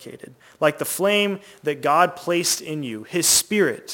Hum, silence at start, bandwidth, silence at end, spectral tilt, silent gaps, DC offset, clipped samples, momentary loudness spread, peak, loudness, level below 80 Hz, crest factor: none; 0 s; 17 kHz; 0 s; -2.5 dB/octave; none; under 0.1%; under 0.1%; 12 LU; -2 dBFS; -20 LUFS; -64 dBFS; 20 dB